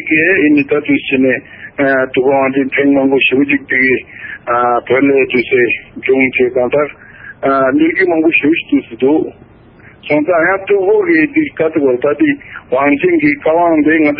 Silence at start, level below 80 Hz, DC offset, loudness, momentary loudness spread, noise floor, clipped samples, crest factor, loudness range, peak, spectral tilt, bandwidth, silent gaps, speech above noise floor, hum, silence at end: 0 s; -50 dBFS; under 0.1%; -12 LUFS; 6 LU; -40 dBFS; under 0.1%; 12 dB; 1 LU; 0 dBFS; -11 dB/octave; 5.2 kHz; none; 29 dB; none; 0 s